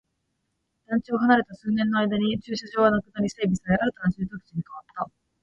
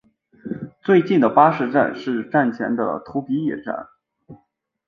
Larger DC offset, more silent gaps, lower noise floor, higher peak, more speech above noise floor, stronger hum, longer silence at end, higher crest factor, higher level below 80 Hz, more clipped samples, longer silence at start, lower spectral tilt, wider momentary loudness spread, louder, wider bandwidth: neither; neither; first, -76 dBFS vs -65 dBFS; second, -6 dBFS vs -2 dBFS; first, 52 dB vs 47 dB; neither; second, 0.35 s vs 0.55 s; about the same, 20 dB vs 18 dB; first, -54 dBFS vs -64 dBFS; neither; first, 0.9 s vs 0.45 s; second, -6.5 dB/octave vs -8.5 dB/octave; about the same, 14 LU vs 16 LU; second, -25 LUFS vs -19 LUFS; first, 8 kHz vs 6.6 kHz